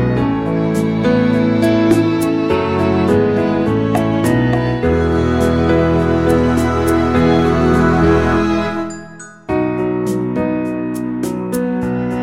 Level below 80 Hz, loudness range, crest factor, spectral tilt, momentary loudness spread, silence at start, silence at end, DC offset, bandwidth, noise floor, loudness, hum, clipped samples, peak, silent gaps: -32 dBFS; 5 LU; 14 dB; -7.5 dB/octave; 8 LU; 0 s; 0 s; under 0.1%; 16 kHz; -34 dBFS; -15 LUFS; none; under 0.1%; 0 dBFS; none